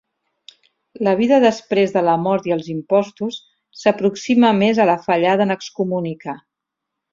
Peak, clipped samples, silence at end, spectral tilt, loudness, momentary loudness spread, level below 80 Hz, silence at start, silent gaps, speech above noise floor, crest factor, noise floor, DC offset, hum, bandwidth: -2 dBFS; under 0.1%; 0.75 s; -6 dB/octave; -18 LUFS; 13 LU; -62 dBFS; 1 s; none; 64 dB; 16 dB; -81 dBFS; under 0.1%; none; 7.6 kHz